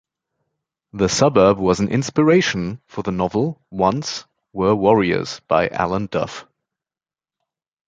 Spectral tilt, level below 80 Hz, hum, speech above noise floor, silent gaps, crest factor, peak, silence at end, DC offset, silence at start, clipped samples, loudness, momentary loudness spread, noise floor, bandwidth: -5.5 dB/octave; -48 dBFS; none; over 72 dB; none; 18 dB; -2 dBFS; 1.45 s; under 0.1%; 0.95 s; under 0.1%; -19 LUFS; 13 LU; under -90 dBFS; 9.4 kHz